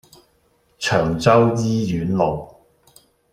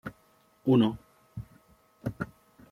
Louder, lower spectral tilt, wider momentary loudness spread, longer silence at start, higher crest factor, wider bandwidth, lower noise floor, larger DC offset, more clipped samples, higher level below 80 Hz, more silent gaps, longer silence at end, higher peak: first, -19 LUFS vs -29 LUFS; second, -6 dB/octave vs -8.5 dB/octave; second, 8 LU vs 22 LU; first, 0.8 s vs 0.05 s; about the same, 18 dB vs 20 dB; about the same, 15.5 kHz vs 14.5 kHz; about the same, -61 dBFS vs -64 dBFS; neither; neither; first, -48 dBFS vs -58 dBFS; neither; first, 0.85 s vs 0.45 s; first, -2 dBFS vs -12 dBFS